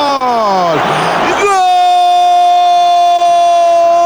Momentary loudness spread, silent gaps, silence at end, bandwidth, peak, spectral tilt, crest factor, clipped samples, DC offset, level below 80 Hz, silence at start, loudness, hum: 4 LU; none; 0 s; over 20 kHz; -2 dBFS; -3.5 dB/octave; 6 dB; under 0.1%; under 0.1%; -50 dBFS; 0 s; -9 LUFS; none